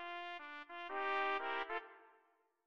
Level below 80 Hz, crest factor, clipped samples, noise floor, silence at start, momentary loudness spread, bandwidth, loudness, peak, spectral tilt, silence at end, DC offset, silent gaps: -82 dBFS; 20 dB; under 0.1%; -76 dBFS; 0 s; 12 LU; 8 kHz; -42 LUFS; -24 dBFS; -2.5 dB/octave; 0 s; under 0.1%; none